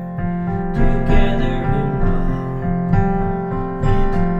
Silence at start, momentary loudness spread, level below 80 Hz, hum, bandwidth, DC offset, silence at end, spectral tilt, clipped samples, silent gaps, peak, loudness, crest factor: 0 s; 5 LU; -20 dBFS; none; 4.1 kHz; under 0.1%; 0 s; -9 dB/octave; under 0.1%; none; -2 dBFS; -20 LUFS; 14 dB